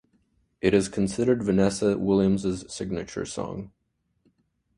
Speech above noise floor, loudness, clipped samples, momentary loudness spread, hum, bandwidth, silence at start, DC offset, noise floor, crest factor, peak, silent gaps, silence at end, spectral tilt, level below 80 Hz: 45 dB; -25 LUFS; under 0.1%; 11 LU; none; 11.5 kHz; 0.65 s; under 0.1%; -69 dBFS; 18 dB; -8 dBFS; none; 1.1 s; -6 dB/octave; -50 dBFS